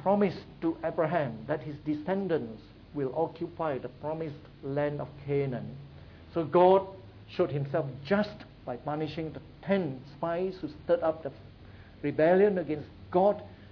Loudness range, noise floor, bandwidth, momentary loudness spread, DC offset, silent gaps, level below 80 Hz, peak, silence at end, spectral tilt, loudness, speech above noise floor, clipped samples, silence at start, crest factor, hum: 5 LU; -50 dBFS; 5.4 kHz; 18 LU; under 0.1%; none; -58 dBFS; -10 dBFS; 0 s; -9.5 dB/octave; -30 LUFS; 21 dB; under 0.1%; 0 s; 20 dB; none